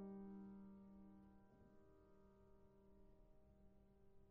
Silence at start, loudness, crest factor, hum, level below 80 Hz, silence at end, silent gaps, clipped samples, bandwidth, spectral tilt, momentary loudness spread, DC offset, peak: 0 s; -61 LUFS; 16 dB; none; -76 dBFS; 0 s; none; under 0.1%; 3 kHz; -8.5 dB/octave; 10 LU; under 0.1%; -46 dBFS